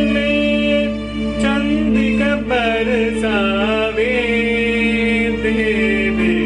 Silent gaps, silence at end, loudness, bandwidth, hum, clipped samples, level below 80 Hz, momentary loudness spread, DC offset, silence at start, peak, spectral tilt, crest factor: none; 0 s; -16 LUFS; 10 kHz; none; under 0.1%; -32 dBFS; 2 LU; under 0.1%; 0 s; -6 dBFS; -6 dB/octave; 10 dB